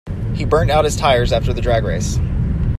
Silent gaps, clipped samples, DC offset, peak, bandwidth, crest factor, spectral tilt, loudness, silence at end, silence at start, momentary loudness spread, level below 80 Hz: none; under 0.1%; under 0.1%; 0 dBFS; 14 kHz; 16 dB; -5.5 dB/octave; -17 LUFS; 0 s; 0.05 s; 5 LU; -24 dBFS